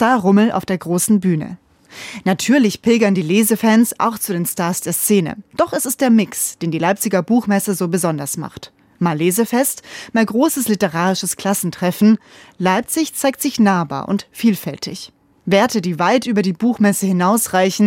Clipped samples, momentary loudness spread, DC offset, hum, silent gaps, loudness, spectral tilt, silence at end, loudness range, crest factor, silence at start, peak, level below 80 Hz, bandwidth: under 0.1%; 9 LU; under 0.1%; none; none; -17 LUFS; -5 dB/octave; 0 s; 2 LU; 16 dB; 0 s; -2 dBFS; -60 dBFS; 17 kHz